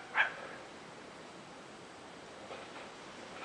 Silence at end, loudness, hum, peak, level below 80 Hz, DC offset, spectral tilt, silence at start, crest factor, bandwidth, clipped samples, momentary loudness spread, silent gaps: 0 s; -42 LUFS; none; -16 dBFS; -78 dBFS; under 0.1%; -2.5 dB/octave; 0 s; 28 dB; 11.5 kHz; under 0.1%; 17 LU; none